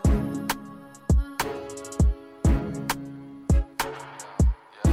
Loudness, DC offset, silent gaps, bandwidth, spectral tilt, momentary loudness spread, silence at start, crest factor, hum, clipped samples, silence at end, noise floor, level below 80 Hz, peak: -27 LUFS; under 0.1%; none; 16 kHz; -6 dB/octave; 12 LU; 0 s; 14 dB; none; under 0.1%; 0 s; -43 dBFS; -28 dBFS; -12 dBFS